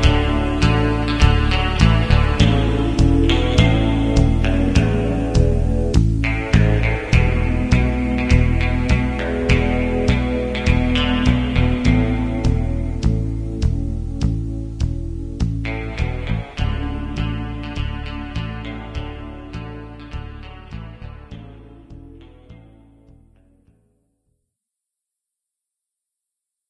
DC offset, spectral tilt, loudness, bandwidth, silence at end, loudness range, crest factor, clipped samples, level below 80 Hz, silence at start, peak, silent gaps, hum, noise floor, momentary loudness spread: 0.3%; -7 dB/octave; -19 LUFS; 10.5 kHz; 4.1 s; 17 LU; 18 dB; under 0.1%; -22 dBFS; 0 s; 0 dBFS; none; none; -83 dBFS; 16 LU